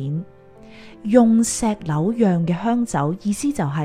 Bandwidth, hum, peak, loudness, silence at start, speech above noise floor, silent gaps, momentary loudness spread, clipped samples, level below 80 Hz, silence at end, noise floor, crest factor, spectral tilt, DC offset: 14.5 kHz; none; 0 dBFS; -19 LUFS; 0 s; 24 dB; none; 8 LU; under 0.1%; -48 dBFS; 0 s; -43 dBFS; 20 dB; -6.5 dB/octave; under 0.1%